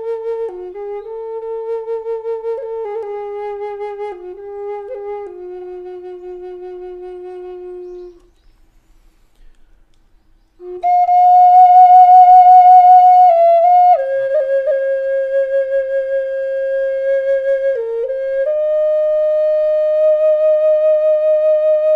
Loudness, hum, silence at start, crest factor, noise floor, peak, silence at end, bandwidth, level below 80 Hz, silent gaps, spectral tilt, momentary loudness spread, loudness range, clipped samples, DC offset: -12 LUFS; none; 0 s; 14 dB; -51 dBFS; 0 dBFS; 0 s; 4.6 kHz; -54 dBFS; none; -5 dB/octave; 24 LU; 22 LU; under 0.1%; under 0.1%